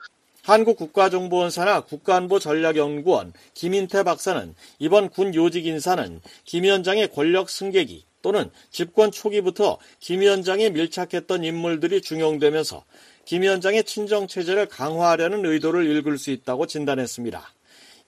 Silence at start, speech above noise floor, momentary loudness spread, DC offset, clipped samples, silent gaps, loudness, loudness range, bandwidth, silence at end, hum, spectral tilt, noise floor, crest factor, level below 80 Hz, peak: 0 s; 30 dB; 10 LU; under 0.1%; under 0.1%; none; -22 LUFS; 2 LU; 15 kHz; 0.6 s; none; -4.5 dB/octave; -52 dBFS; 18 dB; -64 dBFS; -4 dBFS